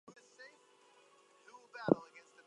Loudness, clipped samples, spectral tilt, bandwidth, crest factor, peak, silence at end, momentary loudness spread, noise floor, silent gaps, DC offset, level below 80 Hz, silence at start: -36 LUFS; under 0.1%; -7.5 dB/octave; 11 kHz; 32 dB; -10 dBFS; 0.3 s; 26 LU; -67 dBFS; none; under 0.1%; -80 dBFS; 0.4 s